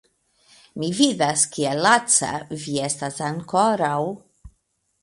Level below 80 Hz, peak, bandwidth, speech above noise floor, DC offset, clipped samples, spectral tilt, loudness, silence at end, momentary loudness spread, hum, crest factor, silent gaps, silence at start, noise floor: -58 dBFS; -2 dBFS; 11.5 kHz; 49 dB; under 0.1%; under 0.1%; -3 dB/octave; -21 LUFS; 0.55 s; 12 LU; none; 22 dB; none; 0.75 s; -70 dBFS